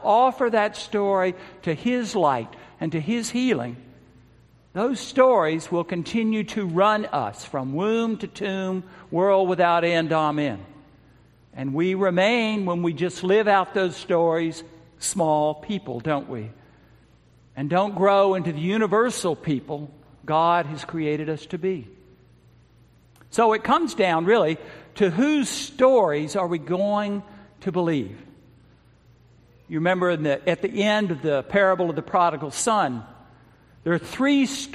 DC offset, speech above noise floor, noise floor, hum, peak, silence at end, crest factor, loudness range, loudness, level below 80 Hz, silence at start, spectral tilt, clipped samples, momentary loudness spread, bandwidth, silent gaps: under 0.1%; 33 dB; -55 dBFS; none; -4 dBFS; 0 s; 20 dB; 5 LU; -23 LUFS; -60 dBFS; 0 s; -5 dB/octave; under 0.1%; 11 LU; 14.5 kHz; none